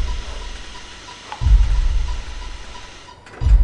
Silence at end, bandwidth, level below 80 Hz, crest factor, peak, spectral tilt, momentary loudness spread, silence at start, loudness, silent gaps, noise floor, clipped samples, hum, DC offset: 0 s; 9 kHz; -20 dBFS; 16 dB; -2 dBFS; -5 dB/octave; 19 LU; 0 s; -23 LUFS; none; -39 dBFS; under 0.1%; none; under 0.1%